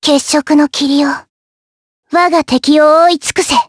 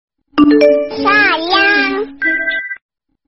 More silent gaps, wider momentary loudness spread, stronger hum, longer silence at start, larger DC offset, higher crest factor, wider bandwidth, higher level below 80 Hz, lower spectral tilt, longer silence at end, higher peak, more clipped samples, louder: first, 1.29-2.03 s vs none; second, 7 LU vs 11 LU; neither; second, 0 s vs 0.35 s; second, under 0.1% vs 0.4%; about the same, 12 dB vs 14 dB; first, 11 kHz vs 6 kHz; about the same, -50 dBFS vs -48 dBFS; first, -2.5 dB/octave vs -0.5 dB/octave; second, 0.05 s vs 0.55 s; about the same, 0 dBFS vs 0 dBFS; neither; about the same, -10 LUFS vs -12 LUFS